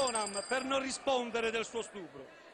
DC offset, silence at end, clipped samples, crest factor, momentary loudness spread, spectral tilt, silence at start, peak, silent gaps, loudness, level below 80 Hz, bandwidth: under 0.1%; 0 s; under 0.1%; 16 dB; 15 LU; -2 dB/octave; 0 s; -18 dBFS; none; -34 LUFS; -68 dBFS; 12 kHz